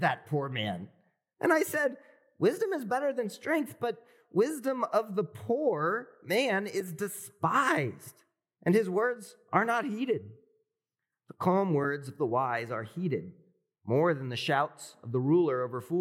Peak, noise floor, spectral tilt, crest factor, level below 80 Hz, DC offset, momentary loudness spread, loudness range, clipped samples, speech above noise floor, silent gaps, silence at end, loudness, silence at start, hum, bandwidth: -10 dBFS; -90 dBFS; -6 dB/octave; 22 dB; -90 dBFS; under 0.1%; 10 LU; 2 LU; under 0.1%; 60 dB; none; 0 s; -30 LUFS; 0 s; none; 17 kHz